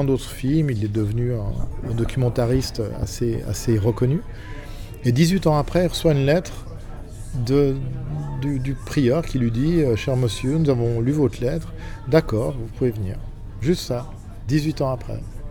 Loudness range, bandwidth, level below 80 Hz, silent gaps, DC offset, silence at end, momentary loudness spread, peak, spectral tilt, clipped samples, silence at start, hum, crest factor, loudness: 3 LU; 18.5 kHz; -34 dBFS; none; under 0.1%; 0 s; 15 LU; -4 dBFS; -7 dB/octave; under 0.1%; 0 s; none; 18 dB; -22 LUFS